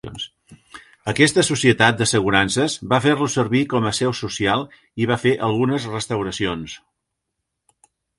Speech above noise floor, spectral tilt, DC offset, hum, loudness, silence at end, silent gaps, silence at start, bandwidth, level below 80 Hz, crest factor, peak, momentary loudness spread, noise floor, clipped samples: 59 dB; -4.5 dB/octave; under 0.1%; none; -19 LUFS; 1.4 s; none; 0.05 s; 11.5 kHz; -50 dBFS; 20 dB; 0 dBFS; 15 LU; -79 dBFS; under 0.1%